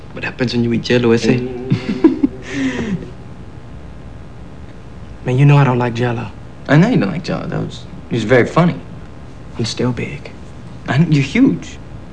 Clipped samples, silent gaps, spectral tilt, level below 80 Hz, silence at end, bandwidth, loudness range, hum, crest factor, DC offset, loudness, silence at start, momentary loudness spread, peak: under 0.1%; none; -7 dB/octave; -40 dBFS; 0 s; 9.4 kHz; 5 LU; none; 16 dB; 2%; -16 LUFS; 0 s; 23 LU; 0 dBFS